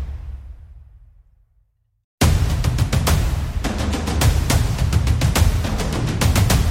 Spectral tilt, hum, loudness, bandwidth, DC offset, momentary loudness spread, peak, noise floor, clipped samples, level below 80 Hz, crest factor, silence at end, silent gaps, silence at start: -5 dB/octave; none; -19 LUFS; 16.5 kHz; under 0.1%; 7 LU; -4 dBFS; -62 dBFS; under 0.1%; -22 dBFS; 16 dB; 0 s; 2.04-2.18 s; 0 s